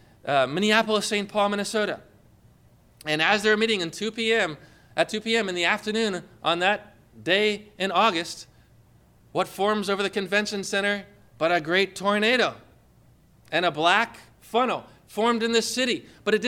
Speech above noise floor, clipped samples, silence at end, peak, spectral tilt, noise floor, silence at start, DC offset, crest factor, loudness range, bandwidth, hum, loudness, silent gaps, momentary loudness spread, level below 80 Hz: 32 dB; under 0.1%; 0 s; -6 dBFS; -3.5 dB/octave; -57 dBFS; 0.25 s; under 0.1%; 20 dB; 2 LU; 16.5 kHz; 60 Hz at -60 dBFS; -24 LUFS; none; 9 LU; -64 dBFS